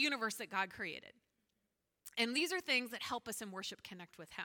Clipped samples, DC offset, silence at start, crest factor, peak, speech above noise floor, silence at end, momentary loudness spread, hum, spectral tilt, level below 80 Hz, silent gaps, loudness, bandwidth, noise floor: under 0.1%; under 0.1%; 0 s; 20 dB; -20 dBFS; 45 dB; 0 s; 16 LU; none; -2 dB/octave; -80 dBFS; none; -39 LUFS; 19 kHz; -86 dBFS